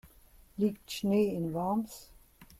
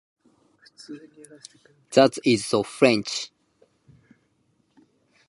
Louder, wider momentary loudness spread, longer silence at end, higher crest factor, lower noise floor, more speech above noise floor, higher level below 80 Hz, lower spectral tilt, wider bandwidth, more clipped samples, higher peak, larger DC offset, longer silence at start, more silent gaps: second, -32 LUFS vs -21 LUFS; second, 16 LU vs 23 LU; second, 0.15 s vs 2.05 s; second, 16 dB vs 24 dB; second, -59 dBFS vs -68 dBFS; second, 28 dB vs 45 dB; first, -60 dBFS vs -68 dBFS; first, -6.5 dB/octave vs -4.5 dB/octave; first, 15.5 kHz vs 11.5 kHz; neither; second, -18 dBFS vs -2 dBFS; neither; second, 0.05 s vs 0.9 s; neither